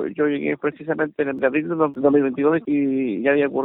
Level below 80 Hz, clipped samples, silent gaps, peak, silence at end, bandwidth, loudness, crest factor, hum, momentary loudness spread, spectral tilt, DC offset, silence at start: -62 dBFS; under 0.1%; none; -4 dBFS; 0 s; 4 kHz; -21 LUFS; 16 dB; none; 6 LU; -11 dB/octave; under 0.1%; 0 s